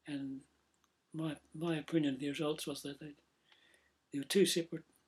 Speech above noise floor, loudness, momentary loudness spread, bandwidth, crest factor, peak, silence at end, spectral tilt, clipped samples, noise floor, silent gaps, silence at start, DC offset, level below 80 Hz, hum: 41 dB; -37 LUFS; 17 LU; 15.5 kHz; 20 dB; -18 dBFS; 0.25 s; -4.5 dB/octave; under 0.1%; -77 dBFS; none; 0.05 s; under 0.1%; -78 dBFS; none